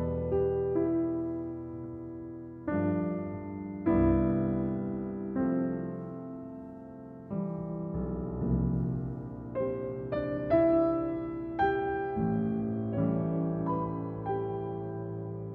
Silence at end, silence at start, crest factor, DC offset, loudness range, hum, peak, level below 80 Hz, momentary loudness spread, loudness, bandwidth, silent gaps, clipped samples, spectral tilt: 0 s; 0 s; 18 dB; under 0.1%; 5 LU; none; -14 dBFS; -48 dBFS; 14 LU; -32 LUFS; 4.3 kHz; none; under 0.1%; -11.5 dB/octave